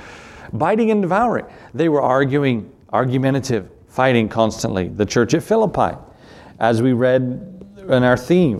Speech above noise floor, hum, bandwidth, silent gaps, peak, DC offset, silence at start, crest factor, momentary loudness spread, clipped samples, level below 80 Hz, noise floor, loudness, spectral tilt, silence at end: 25 dB; none; 13.5 kHz; none; 0 dBFS; under 0.1%; 0 s; 18 dB; 14 LU; under 0.1%; -48 dBFS; -42 dBFS; -18 LUFS; -6.5 dB/octave; 0 s